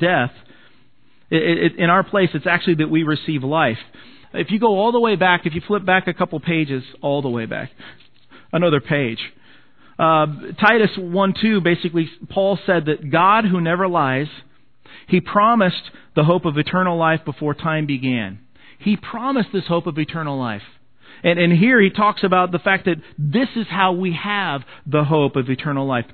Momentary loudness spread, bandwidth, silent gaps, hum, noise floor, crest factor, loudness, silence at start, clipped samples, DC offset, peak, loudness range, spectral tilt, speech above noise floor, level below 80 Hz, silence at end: 9 LU; 5.4 kHz; none; none; -58 dBFS; 18 dB; -18 LUFS; 0 s; under 0.1%; 0.4%; 0 dBFS; 5 LU; -9.5 dB/octave; 40 dB; -58 dBFS; 0.1 s